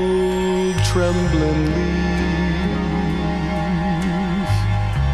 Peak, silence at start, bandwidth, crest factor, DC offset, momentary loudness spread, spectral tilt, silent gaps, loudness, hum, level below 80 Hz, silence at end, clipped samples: -6 dBFS; 0 s; 13 kHz; 12 dB; 0.5%; 3 LU; -6.5 dB/octave; none; -20 LUFS; none; -26 dBFS; 0 s; under 0.1%